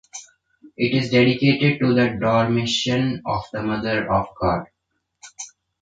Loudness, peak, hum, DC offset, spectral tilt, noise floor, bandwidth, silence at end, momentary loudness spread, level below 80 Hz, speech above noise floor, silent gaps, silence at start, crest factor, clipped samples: -20 LUFS; -4 dBFS; none; under 0.1%; -5.5 dB/octave; -58 dBFS; 9.2 kHz; 0.35 s; 19 LU; -48 dBFS; 38 dB; none; 0.15 s; 18 dB; under 0.1%